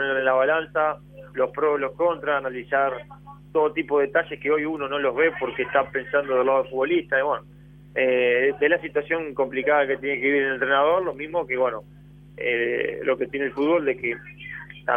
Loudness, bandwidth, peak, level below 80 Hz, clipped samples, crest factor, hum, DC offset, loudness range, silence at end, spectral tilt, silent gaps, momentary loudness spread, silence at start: -23 LUFS; 3.7 kHz; -6 dBFS; -56 dBFS; under 0.1%; 16 dB; 50 Hz at -50 dBFS; under 0.1%; 3 LU; 0 s; -7.5 dB/octave; none; 8 LU; 0 s